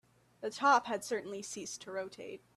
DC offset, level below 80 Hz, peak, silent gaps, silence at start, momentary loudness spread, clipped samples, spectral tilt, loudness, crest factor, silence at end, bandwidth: under 0.1%; -80 dBFS; -16 dBFS; none; 0.4 s; 16 LU; under 0.1%; -2.5 dB/octave; -35 LUFS; 20 dB; 0.2 s; 14 kHz